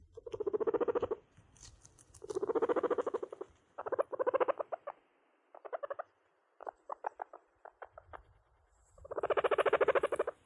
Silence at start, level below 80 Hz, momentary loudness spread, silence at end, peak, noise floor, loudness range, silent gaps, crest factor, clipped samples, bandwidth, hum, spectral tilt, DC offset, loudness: 0.25 s; -70 dBFS; 24 LU; 0.15 s; -16 dBFS; -74 dBFS; 12 LU; none; 20 dB; under 0.1%; 11.5 kHz; none; -5 dB/octave; under 0.1%; -36 LUFS